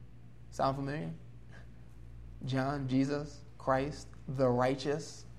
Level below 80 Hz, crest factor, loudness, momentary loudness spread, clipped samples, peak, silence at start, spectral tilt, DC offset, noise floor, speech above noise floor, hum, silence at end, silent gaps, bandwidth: -56 dBFS; 20 dB; -34 LUFS; 22 LU; under 0.1%; -16 dBFS; 0 s; -6.5 dB/octave; 0.2%; -54 dBFS; 20 dB; none; 0 s; none; 12 kHz